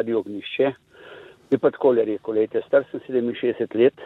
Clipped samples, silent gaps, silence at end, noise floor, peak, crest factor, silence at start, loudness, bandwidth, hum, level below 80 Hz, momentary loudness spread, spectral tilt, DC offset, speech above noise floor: under 0.1%; none; 0 s; -44 dBFS; -6 dBFS; 16 dB; 0 s; -23 LUFS; 4.1 kHz; none; -68 dBFS; 7 LU; -8 dB/octave; under 0.1%; 23 dB